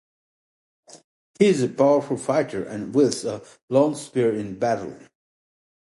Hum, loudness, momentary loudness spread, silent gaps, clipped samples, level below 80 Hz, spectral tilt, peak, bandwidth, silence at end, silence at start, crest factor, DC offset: none; -22 LUFS; 10 LU; 1.04-1.34 s, 3.63-3.68 s; under 0.1%; -64 dBFS; -6 dB/octave; -4 dBFS; 11.5 kHz; 0.9 s; 0.95 s; 20 dB; under 0.1%